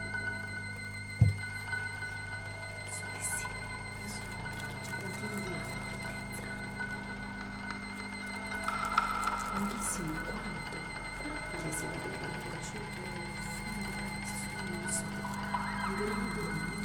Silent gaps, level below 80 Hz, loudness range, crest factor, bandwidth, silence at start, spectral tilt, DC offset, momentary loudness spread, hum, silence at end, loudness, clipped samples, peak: none; -52 dBFS; 4 LU; 26 dB; 20 kHz; 0 s; -4 dB/octave; under 0.1%; 7 LU; 50 Hz at -50 dBFS; 0 s; -37 LUFS; under 0.1%; -12 dBFS